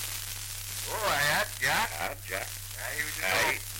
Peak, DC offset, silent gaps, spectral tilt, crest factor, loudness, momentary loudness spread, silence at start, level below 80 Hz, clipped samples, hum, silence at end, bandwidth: -16 dBFS; under 0.1%; none; -1.5 dB/octave; 16 dB; -29 LUFS; 10 LU; 0 s; -50 dBFS; under 0.1%; none; 0 s; 17 kHz